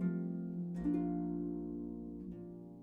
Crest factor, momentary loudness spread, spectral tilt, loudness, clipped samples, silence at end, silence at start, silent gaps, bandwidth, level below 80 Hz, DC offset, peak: 14 dB; 11 LU; -11.5 dB/octave; -40 LUFS; under 0.1%; 0 s; 0 s; none; 2.6 kHz; -60 dBFS; under 0.1%; -26 dBFS